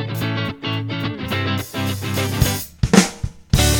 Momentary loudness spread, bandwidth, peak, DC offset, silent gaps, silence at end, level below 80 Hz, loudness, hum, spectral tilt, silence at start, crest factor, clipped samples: 9 LU; 17.5 kHz; 0 dBFS; under 0.1%; none; 0 s; -30 dBFS; -20 LUFS; none; -4.5 dB/octave; 0 s; 20 dB; under 0.1%